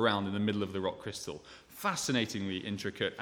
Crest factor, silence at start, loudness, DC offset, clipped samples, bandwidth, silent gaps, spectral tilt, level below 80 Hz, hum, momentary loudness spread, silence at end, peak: 22 dB; 0 s; -34 LUFS; under 0.1%; under 0.1%; 18.5 kHz; none; -4 dB/octave; -68 dBFS; none; 11 LU; 0 s; -12 dBFS